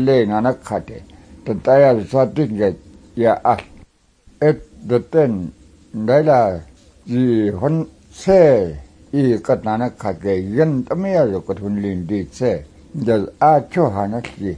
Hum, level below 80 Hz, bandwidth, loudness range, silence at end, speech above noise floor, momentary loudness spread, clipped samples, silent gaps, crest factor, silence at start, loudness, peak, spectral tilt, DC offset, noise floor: none; -46 dBFS; 10.5 kHz; 3 LU; 0 s; 35 dB; 13 LU; under 0.1%; none; 16 dB; 0 s; -17 LUFS; -2 dBFS; -8 dB/octave; under 0.1%; -52 dBFS